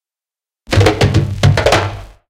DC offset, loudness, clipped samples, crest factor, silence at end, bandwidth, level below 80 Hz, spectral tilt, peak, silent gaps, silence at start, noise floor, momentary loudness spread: under 0.1%; -13 LUFS; under 0.1%; 14 dB; 0.25 s; 15 kHz; -28 dBFS; -5.5 dB/octave; 0 dBFS; none; 0.7 s; under -90 dBFS; 5 LU